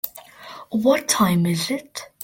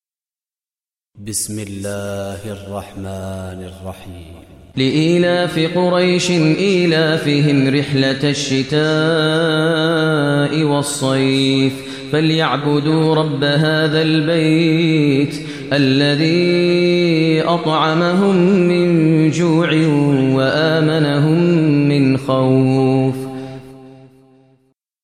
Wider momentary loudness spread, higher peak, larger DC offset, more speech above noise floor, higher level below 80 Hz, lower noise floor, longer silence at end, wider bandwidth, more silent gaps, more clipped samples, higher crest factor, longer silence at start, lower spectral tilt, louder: first, 22 LU vs 14 LU; about the same, -4 dBFS vs -2 dBFS; second, under 0.1% vs 0.2%; second, 21 dB vs over 75 dB; about the same, -58 dBFS vs -54 dBFS; second, -41 dBFS vs under -90 dBFS; second, 0 s vs 1.15 s; first, 17 kHz vs 14 kHz; neither; neither; about the same, 18 dB vs 14 dB; second, 0.05 s vs 1.15 s; second, -4.5 dB/octave vs -6 dB/octave; second, -21 LUFS vs -15 LUFS